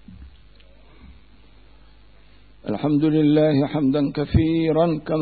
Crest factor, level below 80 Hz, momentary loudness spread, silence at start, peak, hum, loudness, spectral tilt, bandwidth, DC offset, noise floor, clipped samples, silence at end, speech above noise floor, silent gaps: 16 dB; -40 dBFS; 7 LU; 0.1 s; -6 dBFS; none; -20 LUFS; -12.5 dB/octave; 4.7 kHz; 0.3%; -51 dBFS; under 0.1%; 0 s; 32 dB; none